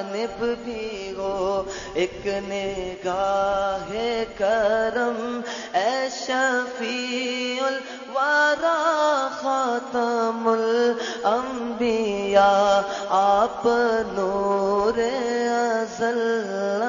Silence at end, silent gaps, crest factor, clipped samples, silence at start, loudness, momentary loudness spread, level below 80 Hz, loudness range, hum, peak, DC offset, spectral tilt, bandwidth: 0 s; none; 18 dB; under 0.1%; 0 s; -23 LUFS; 9 LU; -52 dBFS; 5 LU; none; -6 dBFS; under 0.1%; -3.5 dB/octave; 7.6 kHz